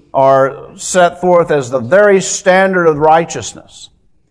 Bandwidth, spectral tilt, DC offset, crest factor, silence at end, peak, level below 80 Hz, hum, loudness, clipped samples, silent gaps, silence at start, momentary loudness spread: 11 kHz; -4.5 dB/octave; under 0.1%; 12 dB; 0.45 s; 0 dBFS; -48 dBFS; none; -11 LUFS; 0.3%; none; 0.15 s; 10 LU